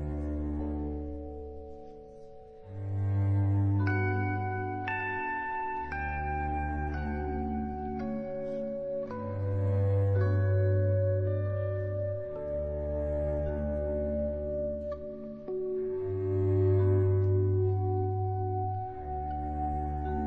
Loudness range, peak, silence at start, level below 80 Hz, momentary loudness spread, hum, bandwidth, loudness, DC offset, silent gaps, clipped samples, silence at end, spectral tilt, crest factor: 5 LU; -18 dBFS; 0 s; -42 dBFS; 11 LU; none; 3.6 kHz; -32 LUFS; under 0.1%; none; under 0.1%; 0 s; -11 dB/octave; 14 dB